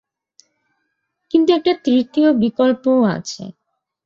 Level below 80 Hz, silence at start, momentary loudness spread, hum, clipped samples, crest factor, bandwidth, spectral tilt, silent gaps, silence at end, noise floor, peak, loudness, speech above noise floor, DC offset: -60 dBFS; 1.35 s; 13 LU; none; under 0.1%; 16 dB; 7.6 kHz; -6 dB/octave; none; 0.55 s; -73 dBFS; -2 dBFS; -16 LUFS; 57 dB; under 0.1%